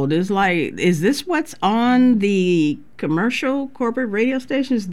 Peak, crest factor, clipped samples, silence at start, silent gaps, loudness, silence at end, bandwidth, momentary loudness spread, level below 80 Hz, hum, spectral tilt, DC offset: -6 dBFS; 12 dB; under 0.1%; 0 s; none; -19 LUFS; 0 s; 13 kHz; 7 LU; -56 dBFS; none; -6 dB/octave; 0.9%